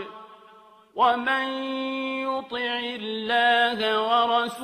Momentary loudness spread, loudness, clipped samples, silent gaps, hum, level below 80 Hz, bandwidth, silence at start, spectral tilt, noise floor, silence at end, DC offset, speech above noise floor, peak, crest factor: 9 LU; -24 LUFS; under 0.1%; none; none; -72 dBFS; 14.5 kHz; 0 s; -3.5 dB/octave; -52 dBFS; 0 s; under 0.1%; 28 dB; -8 dBFS; 18 dB